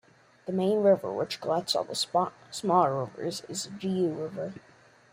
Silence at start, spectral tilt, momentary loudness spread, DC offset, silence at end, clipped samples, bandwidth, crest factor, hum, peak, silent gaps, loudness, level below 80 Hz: 0.45 s; -5 dB/octave; 11 LU; under 0.1%; 0.55 s; under 0.1%; 16 kHz; 20 dB; none; -10 dBFS; none; -29 LUFS; -72 dBFS